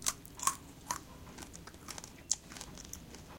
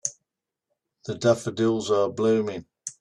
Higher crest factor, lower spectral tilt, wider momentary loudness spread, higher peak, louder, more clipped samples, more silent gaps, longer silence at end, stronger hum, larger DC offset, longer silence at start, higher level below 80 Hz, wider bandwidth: first, 32 dB vs 20 dB; second, -1 dB/octave vs -5 dB/octave; about the same, 14 LU vs 14 LU; second, -10 dBFS vs -6 dBFS; second, -40 LUFS vs -24 LUFS; neither; neither; about the same, 0 s vs 0.1 s; neither; neither; about the same, 0 s vs 0.05 s; first, -60 dBFS vs -66 dBFS; first, 17 kHz vs 12 kHz